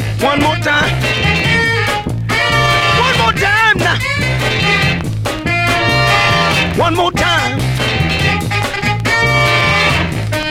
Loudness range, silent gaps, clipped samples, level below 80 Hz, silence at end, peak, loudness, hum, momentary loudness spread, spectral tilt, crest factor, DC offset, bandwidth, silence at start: 1 LU; none; under 0.1%; -30 dBFS; 0 s; 0 dBFS; -12 LUFS; none; 5 LU; -4.5 dB/octave; 14 dB; under 0.1%; 16.5 kHz; 0 s